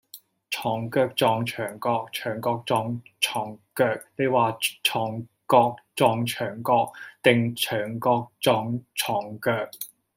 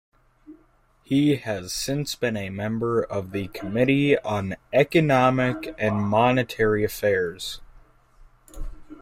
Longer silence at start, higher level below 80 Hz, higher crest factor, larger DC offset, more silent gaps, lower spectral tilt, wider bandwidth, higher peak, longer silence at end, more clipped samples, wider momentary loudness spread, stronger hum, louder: second, 0.15 s vs 0.5 s; second, -68 dBFS vs -46 dBFS; about the same, 22 dB vs 20 dB; neither; neither; second, -4.5 dB/octave vs -6 dB/octave; about the same, 16.5 kHz vs 16 kHz; about the same, -2 dBFS vs -4 dBFS; first, 0.3 s vs 0.05 s; neither; second, 9 LU vs 12 LU; neither; about the same, -25 LUFS vs -23 LUFS